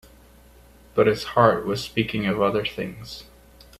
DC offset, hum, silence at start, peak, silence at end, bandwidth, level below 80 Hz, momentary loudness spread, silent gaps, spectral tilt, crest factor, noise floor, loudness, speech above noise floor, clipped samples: under 0.1%; none; 0.95 s; 0 dBFS; 0.55 s; 15 kHz; -50 dBFS; 17 LU; none; -6 dB/octave; 24 dB; -51 dBFS; -23 LUFS; 28 dB; under 0.1%